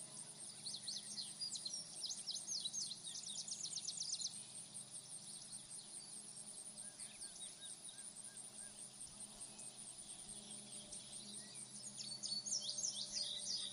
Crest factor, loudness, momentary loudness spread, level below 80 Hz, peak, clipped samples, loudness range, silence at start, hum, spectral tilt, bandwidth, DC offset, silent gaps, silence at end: 20 dB; -46 LUFS; 9 LU; -82 dBFS; -30 dBFS; under 0.1%; 7 LU; 0 s; none; 0 dB/octave; 15 kHz; under 0.1%; none; 0 s